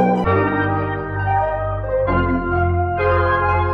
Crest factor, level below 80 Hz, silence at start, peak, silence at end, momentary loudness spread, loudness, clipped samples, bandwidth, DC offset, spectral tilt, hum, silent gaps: 14 dB; -30 dBFS; 0 s; -4 dBFS; 0 s; 5 LU; -19 LUFS; under 0.1%; 5.2 kHz; under 0.1%; -9.5 dB/octave; none; none